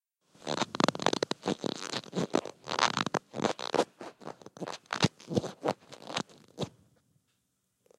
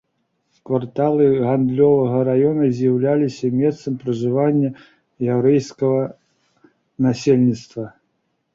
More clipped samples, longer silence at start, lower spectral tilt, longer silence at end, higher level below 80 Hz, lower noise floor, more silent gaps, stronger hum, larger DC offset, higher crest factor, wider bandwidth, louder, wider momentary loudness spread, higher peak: neither; second, 0.4 s vs 0.7 s; second, -4 dB/octave vs -8.5 dB/octave; first, 1.3 s vs 0.65 s; second, -70 dBFS vs -58 dBFS; first, -78 dBFS vs -70 dBFS; neither; neither; neither; first, 28 dB vs 16 dB; first, 15 kHz vs 7.6 kHz; second, -33 LUFS vs -18 LUFS; first, 14 LU vs 9 LU; about the same, -6 dBFS vs -4 dBFS